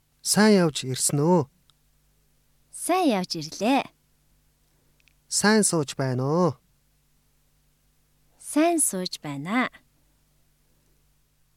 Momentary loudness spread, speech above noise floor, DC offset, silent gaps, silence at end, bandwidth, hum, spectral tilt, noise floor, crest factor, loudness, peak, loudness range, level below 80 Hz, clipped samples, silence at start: 14 LU; 43 dB; under 0.1%; none; 1.9 s; 16.5 kHz; 50 Hz at -60 dBFS; -4 dB/octave; -65 dBFS; 20 dB; -23 LUFS; -6 dBFS; 4 LU; -66 dBFS; under 0.1%; 0.25 s